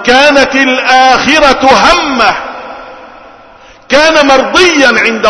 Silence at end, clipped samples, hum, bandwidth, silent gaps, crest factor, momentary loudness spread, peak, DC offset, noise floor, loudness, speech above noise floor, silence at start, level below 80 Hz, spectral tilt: 0 s; 3%; none; 11 kHz; none; 8 dB; 13 LU; 0 dBFS; under 0.1%; -36 dBFS; -5 LUFS; 30 dB; 0 s; -34 dBFS; -2.5 dB/octave